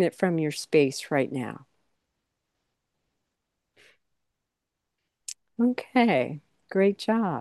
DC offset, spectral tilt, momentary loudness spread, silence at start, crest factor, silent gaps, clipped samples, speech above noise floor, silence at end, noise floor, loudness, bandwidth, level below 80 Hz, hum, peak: under 0.1%; -5.5 dB/octave; 17 LU; 0 s; 22 dB; none; under 0.1%; 59 dB; 0 s; -84 dBFS; -26 LUFS; 12.5 kHz; -76 dBFS; none; -6 dBFS